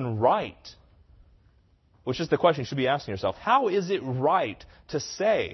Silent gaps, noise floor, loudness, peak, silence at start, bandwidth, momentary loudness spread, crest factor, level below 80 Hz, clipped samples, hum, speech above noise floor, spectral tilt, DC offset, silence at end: none; -62 dBFS; -26 LUFS; -6 dBFS; 0 s; 6.2 kHz; 11 LU; 20 dB; -58 dBFS; under 0.1%; none; 36 dB; -5.5 dB/octave; under 0.1%; 0 s